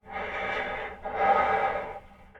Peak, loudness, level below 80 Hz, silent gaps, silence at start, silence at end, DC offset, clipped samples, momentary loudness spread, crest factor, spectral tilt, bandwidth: -10 dBFS; -28 LUFS; -52 dBFS; none; 0.05 s; 0 s; under 0.1%; under 0.1%; 12 LU; 18 dB; -5 dB/octave; 7.6 kHz